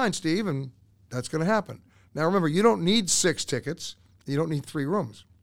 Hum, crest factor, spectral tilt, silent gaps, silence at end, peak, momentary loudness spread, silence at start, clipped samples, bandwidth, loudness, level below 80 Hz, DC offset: none; 18 dB; -4 dB/octave; none; 0.1 s; -8 dBFS; 17 LU; 0 s; under 0.1%; 16.5 kHz; -26 LUFS; -60 dBFS; under 0.1%